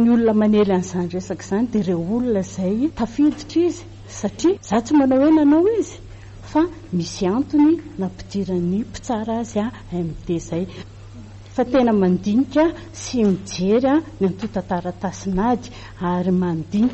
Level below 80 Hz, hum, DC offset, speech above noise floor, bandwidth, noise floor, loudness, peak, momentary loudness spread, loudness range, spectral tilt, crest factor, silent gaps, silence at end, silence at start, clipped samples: -44 dBFS; none; under 0.1%; 19 dB; 8.4 kHz; -38 dBFS; -20 LUFS; -8 dBFS; 12 LU; 4 LU; -7 dB/octave; 10 dB; none; 0 s; 0 s; under 0.1%